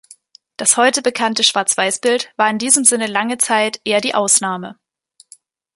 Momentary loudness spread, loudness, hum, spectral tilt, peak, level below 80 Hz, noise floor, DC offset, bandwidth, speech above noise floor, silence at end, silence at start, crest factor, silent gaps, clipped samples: 7 LU; -15 LUFS; none; -1 dB/octave; 0 dBFS; -68 dBFS; -53 dBFS; under 0.1%; 16 kHz; 37 dB; 1 s; 0.6 s; 18 dB; none; under 0.1%